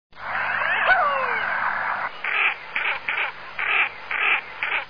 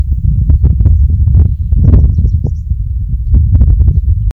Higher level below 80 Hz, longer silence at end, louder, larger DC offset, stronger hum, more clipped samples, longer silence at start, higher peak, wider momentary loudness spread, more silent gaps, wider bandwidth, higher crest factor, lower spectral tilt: second, -62 dBFS vs -10 dBFS; about the same, 0 s vs 0 s; second, -22 LUFS vs -11 LUFS; first, 0.6% vs under 0.1%; neither; second, under 0.1% vs 1%; about the same, 0.1 s vs 0 s; second, -8 dBFS vs 0 dBFS; about the same, 8 LU vs 8 LU; neither; first, 5.4 kHz vs 1.3 kHz; first, 16 dB vs 8 dB; second, -3.5 dB/octave vs -12.5 dB/octave